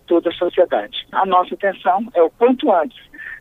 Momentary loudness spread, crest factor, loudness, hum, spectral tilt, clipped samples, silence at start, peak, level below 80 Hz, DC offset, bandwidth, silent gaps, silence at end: 8 LU; 16 dB; -17 LUFS; none; -6.5 dB/octave; under 0.1%; 0.1 s; -2 dBFS; -56 dBFS; under 0.1%; 4.1 kHz; none; 0 s